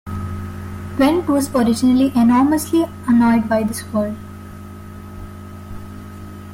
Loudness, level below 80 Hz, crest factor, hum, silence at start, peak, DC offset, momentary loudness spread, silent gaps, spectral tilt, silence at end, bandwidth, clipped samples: -17 LUFS; -44 dBFS; 14 dB; none; 0.05 s; -4 dBFS; under 0.1%; 21 LU; none; -6 dB/octave; 0 s; 16.5 kHz; under 0.1%